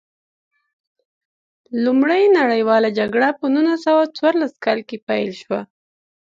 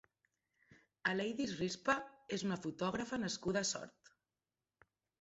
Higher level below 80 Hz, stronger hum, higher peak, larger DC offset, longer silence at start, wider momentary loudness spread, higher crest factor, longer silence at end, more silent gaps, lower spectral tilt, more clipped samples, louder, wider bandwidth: about the same, -68 dBFS vs -72 dBFS; neither; first, -2 dBFS vs -20 dBFS; neither; first, 1.7 s vs 0.7 s; first, 10 LU vs 5 LU; second, 16 dB vs 22 dB; second, 0.65 s vs 1.3 s; first, 5.02-5.07 s vs none; first, -6 dB/octave vs -3.5 dB/octave; neither; first, -18 LUFS vs -39 LUFS; about the same, 7.6 kHz vs 8 kHz